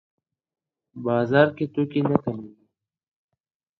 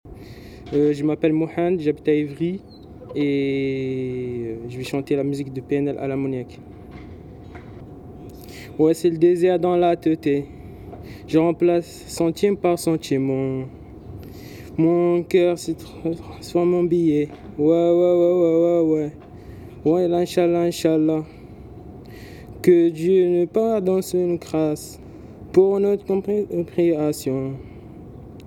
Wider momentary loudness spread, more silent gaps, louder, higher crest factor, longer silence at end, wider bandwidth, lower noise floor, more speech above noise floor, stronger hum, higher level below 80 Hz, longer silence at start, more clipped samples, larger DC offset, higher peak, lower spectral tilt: second, 13 LU vs 23 LU; neither; about the same, -23 LUFS vs -21 LUFS; first, 24 dB vs 18 dB; first, 1.3 s vs 0 s; second, 6 kHz vs 14.5 kHz; first, -70 dBFS vs -40 dBFS; first, 48 dB vs 20 dB; neither; second, -62 dBFS vs -50 dBFS; first, 0.95 s vs 0.05 s; neither; neither; about the same, -2 dBFS vs -2 dBFS; first, -9.5 dB/octave vs -7 dB/octave